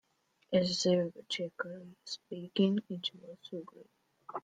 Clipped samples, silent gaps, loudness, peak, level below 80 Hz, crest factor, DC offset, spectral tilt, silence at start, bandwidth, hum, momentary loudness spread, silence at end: under 0.1%; none; -34 LUFS; -16 dBFS; -76 dBFS; 20 dB; under 0.1%; -5 dB/octave; 0.5 s; 9.4 kHz; none; 16 LU; 0.05 s